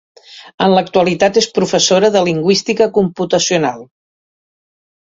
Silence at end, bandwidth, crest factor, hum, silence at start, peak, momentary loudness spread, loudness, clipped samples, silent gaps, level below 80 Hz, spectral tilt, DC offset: 1.2 s; 7.8 kHz; 14 dB; none; 0.3 s; 0 dBFS; 5 LU; -13 LUFS; under 0.1%; 0.54-0.58 s; -54 dBFS; -4 dB/octave; under 0.1%